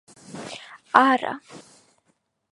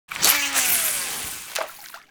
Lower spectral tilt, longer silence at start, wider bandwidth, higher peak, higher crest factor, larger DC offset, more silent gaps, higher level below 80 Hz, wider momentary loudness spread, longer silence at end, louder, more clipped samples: first, -4 dB/octave vs 1 dB/octave; first, 0.3 s vs 0.1 s; second, 11.5 kHz vs over 20 kHz; about the same, 0 dBFS vs 0 dBFS; about the same, 26 dB vs 24 dB; neither; neither; second, -74 dBFS vs -56 dBFS; first, 22 LU vs 14 LU; first, 0.95 s vs 0.1 s; about the same, -20 LUFS vs -20 LUFS; neither